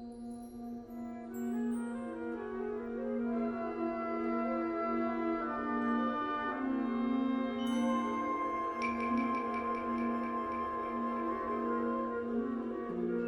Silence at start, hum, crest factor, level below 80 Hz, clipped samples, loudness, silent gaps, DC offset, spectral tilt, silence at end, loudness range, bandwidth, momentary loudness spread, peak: 0 s; none; 14 dB; -64 dBFS; under 0.1%; -35 LUFS; none; under 0.1%; -6.5 dB/octave; 0 s; 4 LU; 15 kHz; 7 LU; -22 dBFS